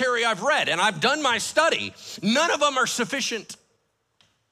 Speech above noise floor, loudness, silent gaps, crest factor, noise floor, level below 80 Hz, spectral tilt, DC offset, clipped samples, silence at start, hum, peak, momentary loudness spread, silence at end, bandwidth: 47 dB; -22 LUFS; none; 18 dB; -71 dBFS; -70 dBFS; -2 dB/octave; under 0.1%; under 0.1%; 0 s; none; -6 dBFS; 8 LU; 0.95 s; 15.5 kHz